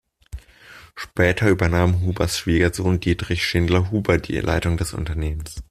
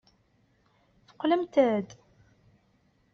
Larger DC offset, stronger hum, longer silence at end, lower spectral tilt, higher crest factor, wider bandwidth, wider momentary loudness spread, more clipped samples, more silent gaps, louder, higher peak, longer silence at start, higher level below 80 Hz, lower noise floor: neither; neither; second, 0.1 s vs 1.2 s; first, -6 dB/octave vs -4.5 dB/octave; about the same, 18 dB vs 22 dB; first, 14.5 kHz vs 7 kHz; first, 17 LU vs 10 LU; neither; neither; first, -21 LUFS vs -27 LUFS; first, -2 dBFS vs -10 dBFS; second, 0.35 s vs 1.2 s; first, -36 dBFS vs -72 dBFS; second, -46 dBFS vs -68 dBFS